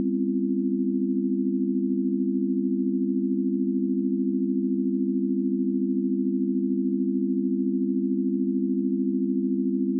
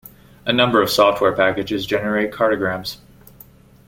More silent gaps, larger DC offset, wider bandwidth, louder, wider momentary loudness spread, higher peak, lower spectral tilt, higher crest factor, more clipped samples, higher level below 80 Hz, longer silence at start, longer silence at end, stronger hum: neither; neither; second, 0.4 kHz vs 17 kHz; second, -25 LUFS vs -18 LUFS; second, 0 LU vs 13 LU; second, -16 dBFS vs -2 dBFS; first, -17 dB/octave vs -4.5 dB/octave; second, 8 dB vs 18 dB; neither; second, under -90 dBFS vs -50 dBFS; second, 0 s vs 0.45 s; second, 0 s vs 0.9 s; neither